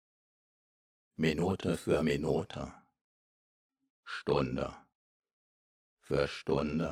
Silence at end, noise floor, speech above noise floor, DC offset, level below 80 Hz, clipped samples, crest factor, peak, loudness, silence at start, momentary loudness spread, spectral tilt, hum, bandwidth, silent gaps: 0 s; under -90 dBFS; over 58 dB; under 0.1%; -56 dBFS; under 0.1%; 20 dB; -16 dBFS; -33 LUFS; 1.2 s; 12 LU; -6.5 dB/octave; none; 15.5 kHz; 3.01-3.70 s, 3.90-4.03 s, 4.95-5.20 s, 5.33-5.97 s